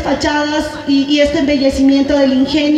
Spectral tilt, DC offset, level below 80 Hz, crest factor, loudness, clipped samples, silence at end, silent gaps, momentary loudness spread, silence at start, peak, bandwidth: -4.5 dB/octave; under 0.1%; -34 dBFS; 12 dB; -13 LUFS; under 0.1%; 0 s; none; 4 LU; 0 s; -2 dBFS; 10 kHz